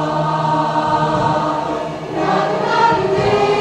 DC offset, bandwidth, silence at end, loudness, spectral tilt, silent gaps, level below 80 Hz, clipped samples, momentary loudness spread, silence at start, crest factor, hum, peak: under 0.1%; 10 kHz; 0 s; -16 LUFS; -6 dB/octave; none; -44 dBFS; under 0.1%; 6 LU; 0 s; 14 dB; none; -2 dBFS